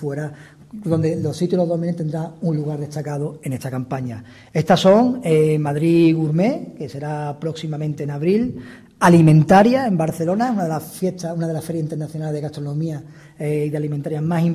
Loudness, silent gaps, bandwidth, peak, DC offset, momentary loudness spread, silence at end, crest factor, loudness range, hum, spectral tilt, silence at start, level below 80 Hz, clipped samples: -19 LUFS; none; 15 kHz; -2 dBFS; under 0.1%; 15 LU; 0 s; 18 dB; 8 LU; none; -7.5 dB/octave; 0 s; -54 dBFS; under 0.1%